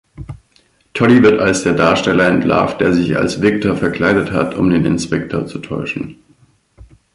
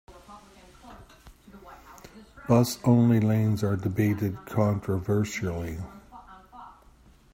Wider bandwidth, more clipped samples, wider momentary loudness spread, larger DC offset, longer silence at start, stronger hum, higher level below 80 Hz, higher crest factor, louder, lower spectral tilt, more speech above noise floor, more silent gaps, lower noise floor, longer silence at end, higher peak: second, 11.5 kHz vs 16 kHz; neither; second, 13 LU vs 26 LU; neither; about the same, 0.2 s vs 0.1 s; neither; first, -42 dBFS vs -54 dBFS; second, 14 dB vs 20 dB; first, -14 LUFS vs -25 LUFS; about the same, -6 dB/octave vs -7 dB/octave; first, 41 dB vs 31 dB; neither; about the same, -55 dBFS vs -56 dBFS; first, 1 s vs 0.65 s; first, 0 dBFS vs -8 dBFS